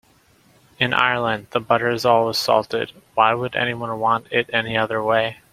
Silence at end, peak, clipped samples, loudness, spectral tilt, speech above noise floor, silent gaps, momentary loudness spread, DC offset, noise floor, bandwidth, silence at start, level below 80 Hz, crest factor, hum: 0.2 s; 0 dBFS; under 0.1%; -20 LUFS; -4.5 dB/octave; 36 dB; none; 6 LU; under 0.1%; -56 dBFS; 16 kHz; 0.8 s; -58 dBFS; 20 dB; none